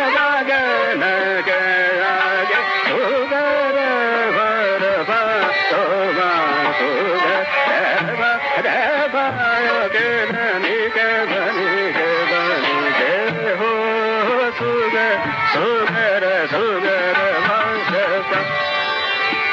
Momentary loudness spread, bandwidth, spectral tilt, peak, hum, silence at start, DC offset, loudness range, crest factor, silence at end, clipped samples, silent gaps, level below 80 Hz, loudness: 2 LU; 7.8 kHz; -1 dB/octave; -6 dBFS; none; 0 s; under 0.1%; 1 LU; 12 dB; 0 s; under 0.1%; none; -64 dBFS; -17 LUFS